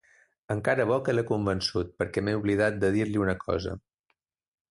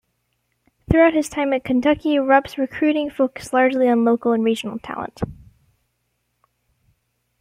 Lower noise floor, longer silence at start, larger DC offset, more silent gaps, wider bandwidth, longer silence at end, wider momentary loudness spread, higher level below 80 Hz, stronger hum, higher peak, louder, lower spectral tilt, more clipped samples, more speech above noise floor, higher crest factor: first, -77 dBFS vs -72 dBFS; second, 0.5 s vs 0.9 s; neither; neither; second, 11.5 kHz vs 15.5 kHz; second, 0.9 s vs 2.05 s; second, 6 LU vs 13 LU; about the same, -50 dBFS vs -46 dBFS; second, none vs 60 Hz at -45 dBFS; second, -12 dBFS vs -2 dBFS; second, -28 LUFS vs -19 LUFS; about the same, -6 dB/octave vs -6 dB/octave; neither; about the same, 50 dB vs 53 dB; about the same, 16 dB vs 18 dB